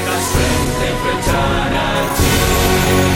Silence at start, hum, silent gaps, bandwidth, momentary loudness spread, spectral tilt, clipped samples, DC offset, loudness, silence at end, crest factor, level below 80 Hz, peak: 0 s; none; none; 17 kHz; 4 LU; -4 dB/octave; under 0.1%; under 0.1%; -15 LUFS; 0 s; 14 dB; -24 dBFS; 0 dBFS